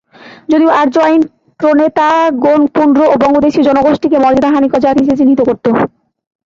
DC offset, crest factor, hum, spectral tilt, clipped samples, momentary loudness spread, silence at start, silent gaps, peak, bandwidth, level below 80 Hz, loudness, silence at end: under 0.1%; 10 dB; none; -6.5 dB/octave; under 0.1%; 5 LU; 0.25 s; none; 0 dBFS; 7.4 kHz; -46 dBFS; -10 LUFS; 0.65 s